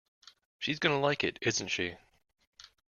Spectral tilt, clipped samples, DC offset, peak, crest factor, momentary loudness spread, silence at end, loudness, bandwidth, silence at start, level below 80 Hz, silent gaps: -3.5 dB/octave; under 0.1%; under 0.1%; -12 dBFS; 22 dB; 8 LU; 0.25 s; -31 LUFS; 11 kHz; 0.6 s; -68 dBFS; 2.47-2.53 s